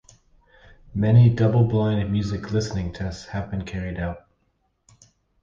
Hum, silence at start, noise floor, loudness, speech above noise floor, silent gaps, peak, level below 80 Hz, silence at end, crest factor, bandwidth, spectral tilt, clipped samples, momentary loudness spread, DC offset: none; 0.9 s; -69 dBFS; -23 LUFS; 48 dB; none; -6 dBFS; -42 dBFS; 1.25 s; 18 dB; 7.4 kHz; -8 dB/octave; under 0.1%; 16 LU; under 0.1%